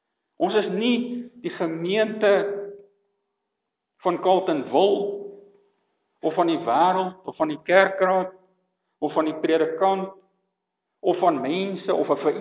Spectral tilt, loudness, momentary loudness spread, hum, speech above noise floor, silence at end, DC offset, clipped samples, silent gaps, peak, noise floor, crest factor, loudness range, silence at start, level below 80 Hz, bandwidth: -9.5 dB/octave; -23 LUFS; 11 LU; none; 59 dB; 0 s; under 0.1%; under 0.1%; none; -2 dBFS; -81 dBFS; 22 dB; 3 LU; 0.4 s; -80 dBFS; 4 kHz